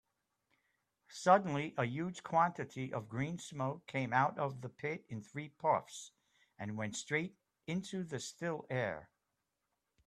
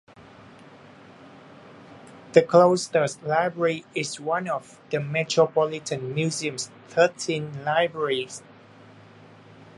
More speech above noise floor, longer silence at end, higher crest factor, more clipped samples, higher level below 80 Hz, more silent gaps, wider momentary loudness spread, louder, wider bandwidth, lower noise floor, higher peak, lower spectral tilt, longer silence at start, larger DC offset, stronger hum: first, 50 dB vs 26 dB; first, 1 s vs 0.15 s; about the same, 24 dB vs 24 dB; neither; about the same, -76 dBFS vs -72 dBFS; neither; about the same, 14 LU vs 12 LU; second, -37 LUFS vs -24 LUFS; first, 13 kHz vs 11.5 kHz; first, -87 dBFS vs -49 dBFS; second, -14 dBFS vs -2 dBFS; about the same, -5.5 dB/octave vs -4.5 dB/octave; first, 1.1 s vs 0.2 s; neither; neither